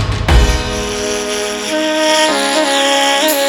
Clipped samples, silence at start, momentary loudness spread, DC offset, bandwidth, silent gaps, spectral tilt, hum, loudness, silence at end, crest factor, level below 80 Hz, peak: under 0.1%; 0 s; 7 LU; under 0.1%; 19 kHz; none; -3.5 dB/octave; none; -13 LUFS; 0 s; 14 dB; -20 dBFS; 0 dBFS